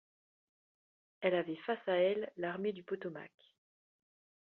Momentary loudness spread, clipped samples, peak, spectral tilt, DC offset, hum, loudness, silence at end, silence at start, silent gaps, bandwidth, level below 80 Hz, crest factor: 13 LU; under 0.1%; -18 dBFS; -4 dB/octave; under 0.1%; none; -37 LUFS; 1.25 s; 1.2 s; none; 4.3 kHz; -86 dBFS; 22 dB